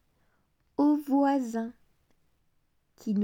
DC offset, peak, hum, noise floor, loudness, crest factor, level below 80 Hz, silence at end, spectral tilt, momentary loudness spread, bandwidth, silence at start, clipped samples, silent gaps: under 0.1%; -14 dBFS; none; -71 dBFS; -27 LUFS; 16 dB; -74 dBFS; 0 s; -7.5 dB/octave; 15 LU; 16.5 kHz; 0.8 s; under 0.1%; none